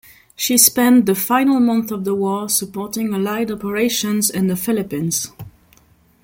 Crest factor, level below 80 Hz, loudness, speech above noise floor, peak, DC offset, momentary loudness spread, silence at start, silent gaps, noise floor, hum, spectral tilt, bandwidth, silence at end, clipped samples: 18 dB; -56 dBFS; -17 LUFS; 36 dB; 0 dBFS; under 0.1%; 11 LU; 0.4 s; none; -53 dBFS; none; -3.5 dB/octave; 17 kHz; 0.75 s; under 0.1%